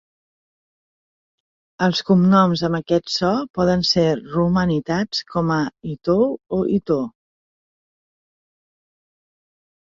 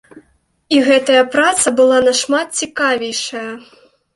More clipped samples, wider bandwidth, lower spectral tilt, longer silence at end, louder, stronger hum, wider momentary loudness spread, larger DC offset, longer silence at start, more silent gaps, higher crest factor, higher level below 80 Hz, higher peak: neither; second, 7.6 kHz vs 11.5 kHz; first, -6.5 dB/octave vs -1.5 dB/octave; first, 2.9 s vs 0.55 s; second, -19 LUFS vs -14 LUFS; neither; second, 8 LU vs 12 LU; neither; first, 1.8 s vs 0.15 s; first, 3.50-3.54 s vs none; about the same, 18 dB vs 14 dB; first, -50 dBFS vs -58 dBFS; second, -4 dBFS vs 0 dBFS